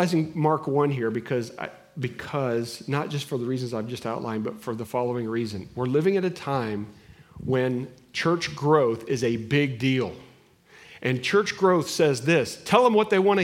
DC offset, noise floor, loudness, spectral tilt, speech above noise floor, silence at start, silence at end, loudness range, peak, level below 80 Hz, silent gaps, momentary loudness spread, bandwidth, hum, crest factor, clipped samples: under 0.1%; -54 dBFS; -25 LUFS; -6 dB/octave; 30 dB; 0 s; 0 s; 6 LU; -4 dBFS; -62 dBFS; none; 12 LU; 16 kHz; none; 20 dB; under 0.1%